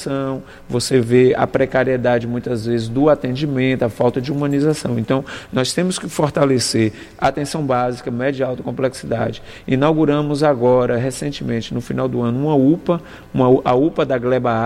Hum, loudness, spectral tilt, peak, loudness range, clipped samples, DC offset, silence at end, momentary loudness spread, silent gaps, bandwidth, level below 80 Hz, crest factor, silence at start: none; -18 LUFS; -6 dB/octave; -2 dBFS; 2 LU; under 0.1%; under 0.1%; 0 s; 8 LU; none; 15.5 kHz; -46 dBFS; 16 dB; 0 s